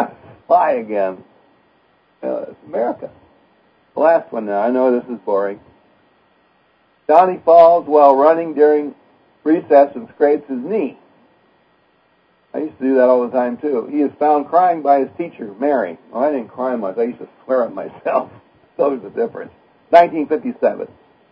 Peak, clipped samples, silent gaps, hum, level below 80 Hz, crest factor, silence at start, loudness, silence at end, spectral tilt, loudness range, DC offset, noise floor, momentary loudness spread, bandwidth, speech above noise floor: 0 dBFS; under 0.1%; none; none; -66 dBFS; 18 dB; 0 s; -16 LUFS; 0.45 s; -8.5 dB/octave; 8 LU; under 0.1%; -58 dBFS; 16 LU; 5.2 kHz; 42 dB